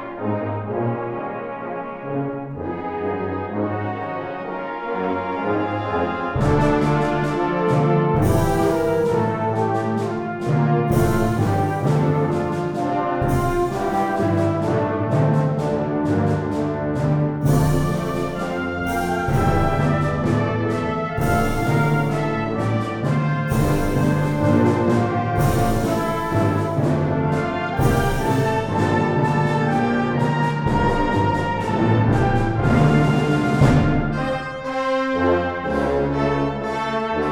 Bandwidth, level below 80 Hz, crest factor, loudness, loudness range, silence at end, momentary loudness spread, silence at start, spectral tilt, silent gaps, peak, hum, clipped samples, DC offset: 20 kHz; -34 dBFS; 18 dB; -21 LUFS; 5 LU; 0 s; 7 LU; 0 s; -7.5 dB/octave; none; -2 dBFS; none; under 0.1%; under 0.1%